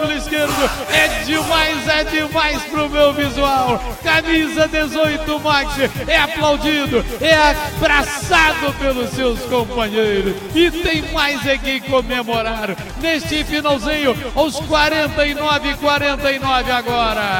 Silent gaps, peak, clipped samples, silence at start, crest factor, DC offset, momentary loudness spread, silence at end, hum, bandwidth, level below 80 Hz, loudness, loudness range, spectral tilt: none; -2 dBFS; under 0.1%; 0 s; 14 dB; under 0.1%; 5 LU; 0 s; none; 17 kHz; -32 dBFS; -16 LUFS; 3 LU; -4 dB/octave